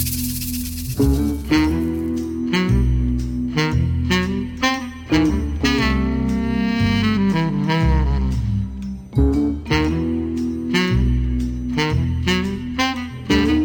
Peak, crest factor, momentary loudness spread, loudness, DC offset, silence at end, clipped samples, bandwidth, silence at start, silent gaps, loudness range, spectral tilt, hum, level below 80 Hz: -4 dBFS; 16 dB; 6 LU; -20 LUFS; under 0.1%; 0 s; under 0.1%; over 20 kHz; 0 s; none; 2 LU; -6 dB/octave; none; -26 dBFS